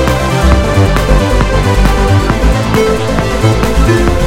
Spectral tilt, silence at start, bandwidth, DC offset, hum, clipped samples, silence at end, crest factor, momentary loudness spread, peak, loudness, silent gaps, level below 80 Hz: -6 dB/octave; 0 s; 16 kHz; under 0.1%; none; 0.1%; 0 s; 10 dB; 2 LU; 0 dBFS; -11 LUFS; none; -14 dBFS